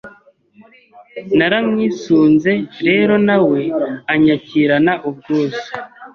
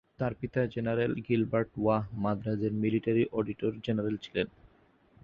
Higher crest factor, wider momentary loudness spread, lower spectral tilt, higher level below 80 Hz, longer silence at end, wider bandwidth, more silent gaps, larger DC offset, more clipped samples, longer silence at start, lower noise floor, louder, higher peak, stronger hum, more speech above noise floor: about the same, 14 dB vs 18 dB; first, 10 LU vs 6 LU; second, -7 dB/octave vs -9 dB/octave; about the same, -54 dBFS vs -58 dBFS; second, 0.05 s vs 0.8 s; about the same, 6.8 kHz vs 6.8 kHz; neither; neither; neither; second, 0.05 s vs 0.2 s; second, -48 dBFS vs -64 dBFS; first, -15 LUFS vs -31 LUFS; first, -2 dBFS vs -14 dBFS; neither; about the same, 34 dB vs 34 dB